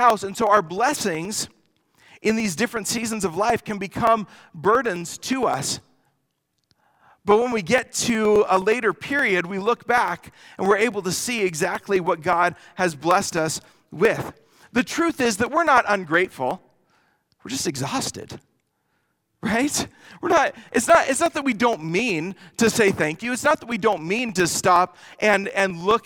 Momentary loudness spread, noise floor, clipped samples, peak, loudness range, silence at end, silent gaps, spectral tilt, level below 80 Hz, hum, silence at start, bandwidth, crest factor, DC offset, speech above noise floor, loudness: 10 LU; -74 dBFS; under 0.1%; -2 dBFS; 5 LU; 0.05 s; none; -3.5 dB/octave; -56 dBFS; none; 0 s; 19 kHz; 20 dB; under 0.1%; 52 dB; -22 LUFS